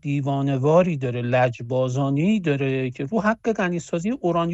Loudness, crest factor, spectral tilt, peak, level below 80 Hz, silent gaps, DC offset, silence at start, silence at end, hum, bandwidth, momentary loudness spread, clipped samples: -22 LUFS; 16 dB; -7.5 dB/octave; -6 dBFS; -56 dBFS; none; under 0.1%; 0.05 s; 0 s; none; 8.2 kHz; 7 LU; under 0.1%